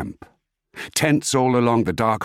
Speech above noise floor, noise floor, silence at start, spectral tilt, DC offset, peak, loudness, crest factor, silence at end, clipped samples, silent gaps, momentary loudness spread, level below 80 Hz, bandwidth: 28 dB; -48 dBFS; 0 s; -5 dB/octave; under 0.1%; -4 dBFS; -19 LUFS; 16 dB; 0 s; under 0.1%; none; 13 LU; -52 dBFS; 16.5 kHz